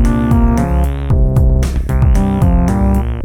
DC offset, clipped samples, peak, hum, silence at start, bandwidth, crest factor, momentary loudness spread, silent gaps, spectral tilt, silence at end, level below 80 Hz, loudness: under 0.1%; under 0.1%; 0 dBFS; none; 0 s; 14 kHz; 10 dB; 3 LU; none; -8.5 dB/octave; 0 s; -14 dBFS; -13 LUFS